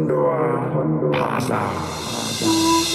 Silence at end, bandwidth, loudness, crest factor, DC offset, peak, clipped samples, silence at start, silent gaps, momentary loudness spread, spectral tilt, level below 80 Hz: 0 s; 15.5 kHz; -20 LUFS; 14 dB; under 0.1%; -6 dBFS; under 0.1%; 0 s; none; 8 LU; -4.5 dB/octave; -50 dBFS